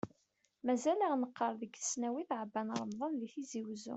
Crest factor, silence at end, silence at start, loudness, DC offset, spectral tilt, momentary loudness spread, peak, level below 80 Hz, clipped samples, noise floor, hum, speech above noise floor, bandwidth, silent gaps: 16 dB; 0 s; 0.05 s; -38 LUFS; under 0.1%; -4 dB/octave; 10 LU; -22 dBFS; -80 dBFS; under 0.1%; -78 dBFS; none; 41 dB; 8.2 kHz; none